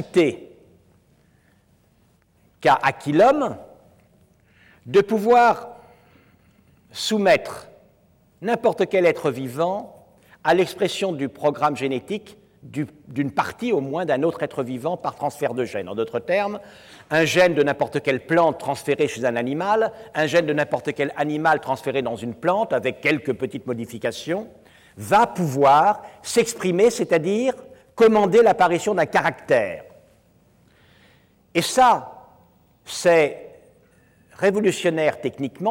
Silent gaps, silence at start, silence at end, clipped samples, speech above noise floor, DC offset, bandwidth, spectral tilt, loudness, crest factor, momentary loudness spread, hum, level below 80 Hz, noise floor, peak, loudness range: none; 0 s; 0 s; under 0.1%; 40 dB; under 0.1%; 17 kHz; -5 dB/octave; -21 LUFS; 14 dB; 12 LU; none; -62 dBFS; -60 dBFS; -8 dBFS; 6 LU